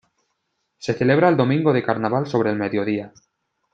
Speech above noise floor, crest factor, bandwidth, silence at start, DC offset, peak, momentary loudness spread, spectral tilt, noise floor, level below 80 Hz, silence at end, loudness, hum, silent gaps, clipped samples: 54 dB; 18 dB; 7.8 kHz; 0.8 s; under 0.1%; -2 dBFS; 11 LU; -7.5 dB/octave; -74 dBFS; -62 dBFS; 0.65 s; -20 LUFS; none; none; under 0.1%